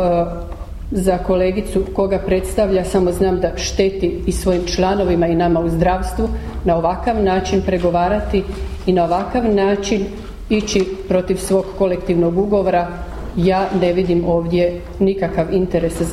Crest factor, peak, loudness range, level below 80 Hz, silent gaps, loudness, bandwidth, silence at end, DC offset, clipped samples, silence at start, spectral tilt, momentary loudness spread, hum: 14 dB; -2 dBFS; 1 LU; -28 dBFS; none; -18 LUFS; 14.5 kHz; 0 s; under 0.1%; under 0.1%; 0 s; -6 dB/octave; 5 LU; none